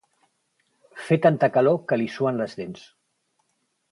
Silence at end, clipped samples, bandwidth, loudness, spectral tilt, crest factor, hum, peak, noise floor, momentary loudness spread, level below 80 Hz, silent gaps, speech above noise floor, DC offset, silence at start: 1.2 s; under 0.1%; 11.5 kHz; -22 LUFS; -7.5 dB/octave; 20 dB; none; -4 dBFS; -73 dBFS; 18 LU; -68 dBFS; none; 51 dB; under 0.1%; 0.95 s